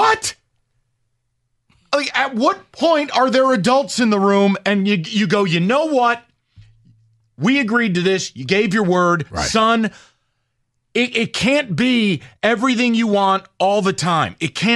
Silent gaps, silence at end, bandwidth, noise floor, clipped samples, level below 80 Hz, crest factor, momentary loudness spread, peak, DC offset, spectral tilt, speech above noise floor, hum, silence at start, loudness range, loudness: none; 0 s; 12 kHz; -70 dBFS; under 0.1%; -50 dBFS; 16 dB; 5 LU; -2 dBFS; under 0.1%; -4.5 dB/octave; 53 dB; none; 0 s; 3 LU; -17 LUFS